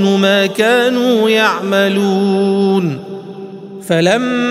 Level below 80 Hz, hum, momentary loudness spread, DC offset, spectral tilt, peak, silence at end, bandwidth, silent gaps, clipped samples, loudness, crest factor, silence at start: -62 dBFS; none; 17 LU; under 0.1%; -5.5 dB/octave; 0 dBFS; 0 s; 15.5 kHz; none; under 0.1%; -13 LUFS; 12 dB; 0 s